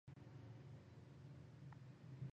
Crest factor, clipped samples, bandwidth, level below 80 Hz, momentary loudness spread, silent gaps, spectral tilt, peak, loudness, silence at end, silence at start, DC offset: 16 dB; under 0.1%; 8.4 kHz; -76 dBFS; 2 LU; none; -8 dB/octave; -42 dBFS; -60 LUFS; 0.05 s; 0.05 s; under 0.1%